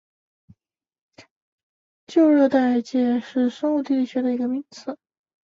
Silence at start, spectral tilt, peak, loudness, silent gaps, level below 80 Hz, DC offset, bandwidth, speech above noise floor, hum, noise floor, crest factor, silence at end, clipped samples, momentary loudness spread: 1.2 s; -5.5 dB/octave; -6 dBFS; -21 LUFS; 1.31-2.07 s; -70 dBFS; under 0.1%; 7.4 kHz; 59 dB; none; -80 dBFS; 16 dB; 0.55 s; under 0.1%; 18 LU